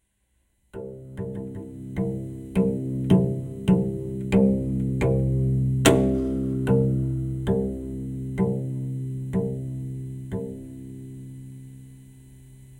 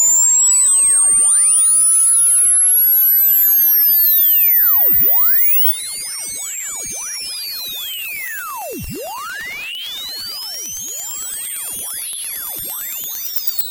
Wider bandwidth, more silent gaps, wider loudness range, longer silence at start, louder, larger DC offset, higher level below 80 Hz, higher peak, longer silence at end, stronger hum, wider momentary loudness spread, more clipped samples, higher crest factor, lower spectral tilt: about the same, 16 kHz vs 17.5 kHz; neither; second, 10 LU vs 15 LU; first, 0.75 s vs 0 s; second, -25 LUFS vs -11 LUFS; neither; first, -40 dBFS vs -52 dBFS; first, -2 dBFS vs -6 dBFS; about the same, 0 s vs 0 s; neither; first, 19 LU vs 15 LU; neither; first, 24 dB vs 10 dB; first, -7 dB/octave vs 1.5 dB/octave